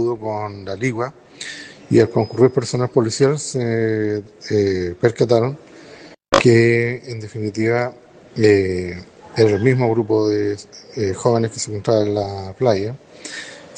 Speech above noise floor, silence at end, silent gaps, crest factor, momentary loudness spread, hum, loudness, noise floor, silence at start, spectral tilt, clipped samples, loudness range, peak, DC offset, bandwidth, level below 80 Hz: 24 dB; 0 s; none; 18 dB; 16 LU; none; -18 LUFS; -42 dBFS; 0 s; -6 dB/octave; under 0.1%; 2 LU; -2 dBFS; under 0.1%; 9.8 kHz; -54 dBFS